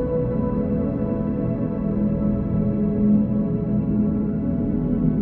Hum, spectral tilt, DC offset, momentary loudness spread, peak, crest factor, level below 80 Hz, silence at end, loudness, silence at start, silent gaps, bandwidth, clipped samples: none; -13.5 dB/octave; under 0.1%; 5 LU; -8 dBFS; 14 dB; -34 dBFS; 0 s; -22 LUFS; 0 s; none; 2.8 kHz; under 0.1%